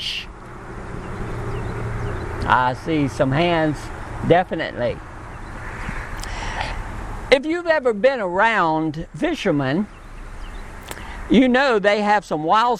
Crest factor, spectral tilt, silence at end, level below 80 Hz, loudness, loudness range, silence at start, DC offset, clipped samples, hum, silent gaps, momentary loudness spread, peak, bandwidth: 20 dB; -6 dB/octave; 0 s; -36 dBFS; -20 LUFS; 5 LU; 0 s; under 0.1%; under 0.1%; none; none; 18 LU; 0 dBFS; 15 kHz